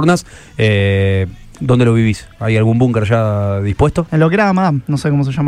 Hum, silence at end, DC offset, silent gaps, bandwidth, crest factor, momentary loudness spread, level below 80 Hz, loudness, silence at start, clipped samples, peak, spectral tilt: none; 0 s; under 0.1%; none; 11.5 kHz; 12 dB; 6 LU; -34 dBFS; -14 LUFS; 0 s; under 0.1%; 0 dBFS; -7.5 dB/octave